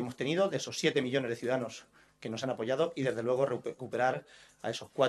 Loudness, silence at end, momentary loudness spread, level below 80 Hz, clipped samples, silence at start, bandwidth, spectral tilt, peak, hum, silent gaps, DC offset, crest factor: -33 LUFS; 0 s; 11 LU; -76 dBFS; under 0.1%; 0 s; 12.5 kHz; -5 dB/octave; -12 dBFS; none; none; under 0.1%; 20 dB